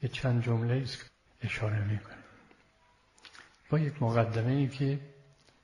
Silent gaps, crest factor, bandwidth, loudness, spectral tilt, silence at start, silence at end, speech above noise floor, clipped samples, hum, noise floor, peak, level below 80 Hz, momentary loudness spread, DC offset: none; 20 dB; 11 kHz; -32 LUFS; -7.5 dB/octave; 0 s; 0.5 s; 36 dB; under 0.1%; none; -66 dBFS; -12 dBFS; -60 dBFS; 23 LU; under 0.1%